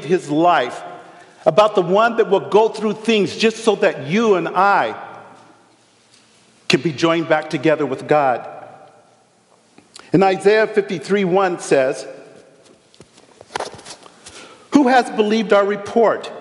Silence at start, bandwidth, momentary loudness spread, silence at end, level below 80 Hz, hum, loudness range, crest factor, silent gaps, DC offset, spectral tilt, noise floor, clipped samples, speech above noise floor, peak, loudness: 0 s; 11.5 kHz; 18 LU; 0 s; -66 dBFS; none; 5 LU; 18 dB; none; under 0.1%; -5 dB/octave; -55 dBFS; under 0.1%; 39 dB; 0 dBFS; -17 LUFS